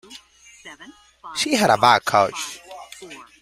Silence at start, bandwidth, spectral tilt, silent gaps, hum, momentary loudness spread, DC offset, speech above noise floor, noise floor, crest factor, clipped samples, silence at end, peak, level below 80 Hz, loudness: 0.1 s; 16 kHz; -3 dB/octave; none; none; 25 LU; under 0.1%; 30 dB; -49 dBFS; 22 dB; under 0.1%; 0.2 s; 0 dBFS; -60 dBFS; -18 LUFS